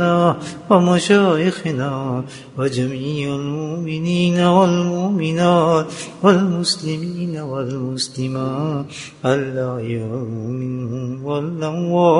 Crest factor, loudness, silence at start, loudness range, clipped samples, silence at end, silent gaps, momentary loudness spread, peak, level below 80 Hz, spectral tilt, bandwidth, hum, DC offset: 18 dB; -19 LUFS; 0 s; 6 LU; under 0.1%; 0 s; none; 11 LU; 0 dBFS; -56 dBFS; -6 dB/octave; 11 kHz; none; under 0.1%